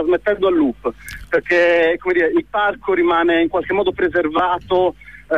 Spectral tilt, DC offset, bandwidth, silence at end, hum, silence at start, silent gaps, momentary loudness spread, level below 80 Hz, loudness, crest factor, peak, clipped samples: -5.5 dB/octave; 0.3%; 12.5 kHz; 0 s; none; 0 s; none; 7 LU; -44 dBFS; -17 LUFS; 12 dB; -4 dBFS; under 0.1%